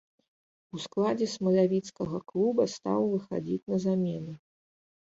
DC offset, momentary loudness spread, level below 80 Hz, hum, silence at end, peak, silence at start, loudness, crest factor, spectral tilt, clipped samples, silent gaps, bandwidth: under 0.1%; 14 LU; -68 dBFS; none; 0.75 s; -14 dBFS; 0.75 s; -29 LUFS; 16 dB; -7 dB/octave; under 0.1%; 3.63-3.67 s; 8 kHz